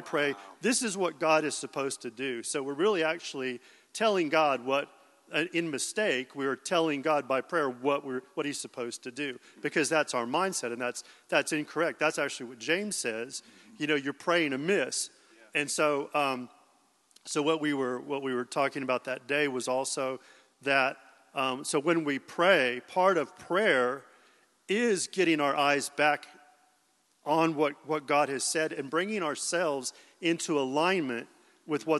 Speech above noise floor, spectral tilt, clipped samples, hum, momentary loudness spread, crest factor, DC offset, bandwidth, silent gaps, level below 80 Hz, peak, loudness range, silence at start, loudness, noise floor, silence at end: 40 dB; -3 dB/octave; under 0.1%; none; 10 LU; 22 dB; under 0.1%; 12.5 kHz; none; -88 dBFS; -8 dBFS; 3 LU; 0 s; -29 LUFS; -70 dBFS; 0 s